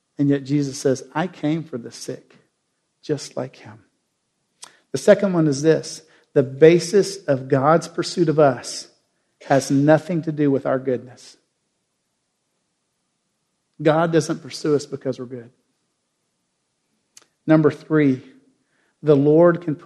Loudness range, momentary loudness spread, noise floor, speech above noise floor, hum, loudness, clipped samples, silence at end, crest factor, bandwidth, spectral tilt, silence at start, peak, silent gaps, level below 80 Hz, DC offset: 11 LU; 17 LU; -73 dBFS; 54 dB; none; -19 LUFS; under 0.1%; 0.1 s; 22 dB; 12 kHz; -6.5 dB/octave; 0.2 s; 0 dBFS; none; -68 dBFS; under 0.1%